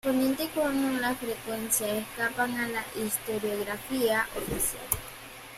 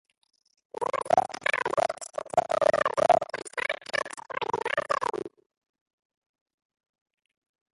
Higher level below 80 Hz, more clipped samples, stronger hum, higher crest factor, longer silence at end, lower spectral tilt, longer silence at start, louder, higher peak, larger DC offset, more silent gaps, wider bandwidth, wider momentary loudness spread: first, -54 dBFS vs -66 dBFS; neither; neither; about the same, 20 dB vs 22 dB; second, 0 s vs 2.45 s; about the same, -3 dB/octave vs -3 dB/octave; second, 0.05 s vs 0.8 s; about the same, -29 LUFS vs -28 LUFS; about the same, -10 dBFS vs -8 dBFS; neither; neither; first, 16 kHz vs 11.5 kHz; second, 6 LU vs 11 LU